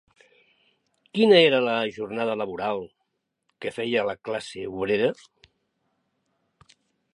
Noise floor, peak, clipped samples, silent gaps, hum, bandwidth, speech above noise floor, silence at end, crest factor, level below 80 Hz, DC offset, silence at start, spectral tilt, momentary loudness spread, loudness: -77 dBFS; -4 dBFS; under 0.1%; none; none; 11 kHz; 54 dB; 2.05 s; 22 dB; -66 dBFS; under 0.1%; 1.15 s; -5.5 dB/octave; 17 LU; -24 LUFS